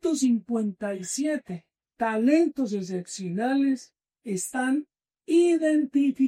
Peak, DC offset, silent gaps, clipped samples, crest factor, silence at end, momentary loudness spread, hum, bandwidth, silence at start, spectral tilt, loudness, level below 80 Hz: -10 dBFS; under 0.1%; none; under 0.1%; 16 dB; 0 s; 11 LU; none; 15 kHz; 0.05 s; -5 dB/octave; -26 LUFS; -74 dBFS